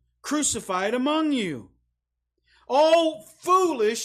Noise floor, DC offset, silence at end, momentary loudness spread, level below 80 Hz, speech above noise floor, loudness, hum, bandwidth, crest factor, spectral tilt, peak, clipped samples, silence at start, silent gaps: -80 dBFS; under 0.1%; 0 s; 11 LU; -62 dBFS; 57 dB; -23 LUFS; 60 Hz at -65 dBFS; 15.5 kHz; 14 dB; -3 dB/octave; -10 dBFS; under 0.1%; 0.25 s; none